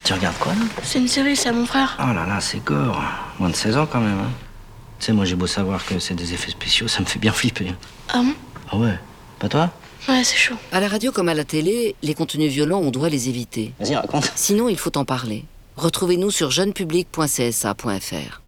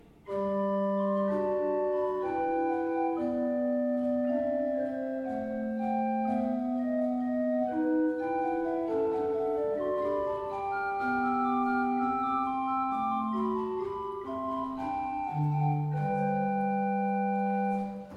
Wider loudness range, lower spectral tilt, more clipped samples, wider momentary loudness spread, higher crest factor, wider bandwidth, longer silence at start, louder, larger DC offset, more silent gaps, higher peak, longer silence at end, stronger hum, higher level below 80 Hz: about the same, 2 LU vs 2 LU; second, -4 dB/octave vs -9.5 dB/octave; neither; first, 9 LU vs 5 LU; about the same, 16 dB vs 12 dB; first, 19.5 kHz vs 6.6 kHz; second, 0 s vs 0.25 s; first, -21 LUFS vs -30 LUFS; neither; neither; first, -4 dBFS vs -18 dBFS; about the same, 0.05 s vs 0 s; neither; first, -44 dBFS vs -62 dBFS